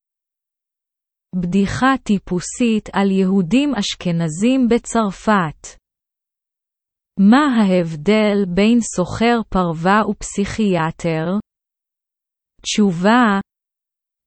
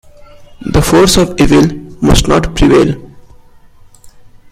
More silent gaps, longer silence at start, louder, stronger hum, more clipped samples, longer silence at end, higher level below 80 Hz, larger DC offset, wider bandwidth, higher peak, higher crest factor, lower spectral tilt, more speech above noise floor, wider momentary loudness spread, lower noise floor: neither; first, 1.35 s vs 0.4 s; second, -17 LUFS vs -10 LUFS; neither; neither; first, 0.85 s vs 0.45 s; second, -44 dBFS vs -22 dBFS; neither; second, 8.8 kHz vs 16 kHz; about the same, 0 dBFS vs 0 dBFS; first, 18 dB vs 12 dB; about the same, -5.5 dB/octave vs -5 dB/octave; first, 66 dB vs 31 dB; about the same, 9 LU vs 8 LU; first, -83 dBFS vs -39 dBFS